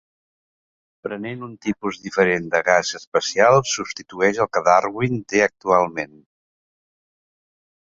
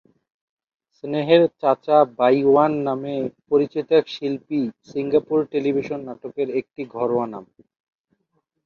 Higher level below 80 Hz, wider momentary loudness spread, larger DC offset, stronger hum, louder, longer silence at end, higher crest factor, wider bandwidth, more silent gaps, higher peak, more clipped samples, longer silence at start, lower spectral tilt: first, -58 dBFS vs -66 dBFS; about the same, 14 LU vs 13 LU; neither; neither; about the same, -20 LUFS vs -21 LUFS; first, 1.9 s vs 1.25 s; about the same, 20 dB vs 20 dB; first, 7.8 kHz vs 6.8 kHz; first, 3.07-3.12 s vs none; about the same, -2 dBFS vs -2 dBFS; neither; about the same, 1.05 s vs 1.05 s; second, -4 dB/octave vs -8 dB/octave